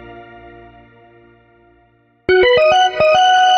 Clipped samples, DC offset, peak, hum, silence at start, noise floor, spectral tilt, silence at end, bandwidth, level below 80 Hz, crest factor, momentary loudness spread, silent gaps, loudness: under 0.1%; under 0.1%; -2 dBFS; none; 0.1 s; -55 dBFS; -3 dB/octave; 0 s; 9.4 kHz; -48 dBFS; 12 dB; 5 LU; none; -12 LUFS